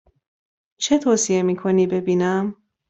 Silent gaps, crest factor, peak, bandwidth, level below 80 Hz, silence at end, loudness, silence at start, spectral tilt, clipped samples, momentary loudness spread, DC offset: none; 16 dB; -4 dBFS; 8.2 kHz; -60 dBFS; 0.35 s; -20 LUFS; 0.8 s; -5 dB/octave; under 0.1%; 7 LU; under 0.1%